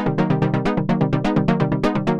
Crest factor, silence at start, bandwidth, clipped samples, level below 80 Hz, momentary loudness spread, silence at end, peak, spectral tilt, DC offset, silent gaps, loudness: 14 dB; 0 s; 8.4 kHz; under 0.1%; -38 dBFS; 1 LU; 0 s; -4 dBFS; -8.5 dB/octave; under 0.1%; none; -20 LUFS